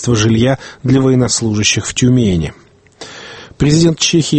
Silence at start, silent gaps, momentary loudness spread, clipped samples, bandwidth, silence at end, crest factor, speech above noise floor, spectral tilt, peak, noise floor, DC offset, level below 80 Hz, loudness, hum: 0 s; none; 19 LU; under 0.1%; 8.8 kHz; 0 s; 14 dB; 24 dB; -5 dB/octave; 0 dBFS; -36 dBFS; under 0.1%; -36 dBFS; -12 LUFS; none